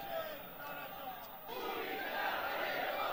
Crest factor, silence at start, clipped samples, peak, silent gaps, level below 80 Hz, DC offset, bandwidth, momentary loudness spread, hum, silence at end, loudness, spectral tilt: 16 dB; 0 s; under 0.1%; -24 dBFS; none; -70 dBFS; under 0.1%; 16.5 kHz; 9 LU; none; 0 s; -40 LUFS; -3.5 dB/octave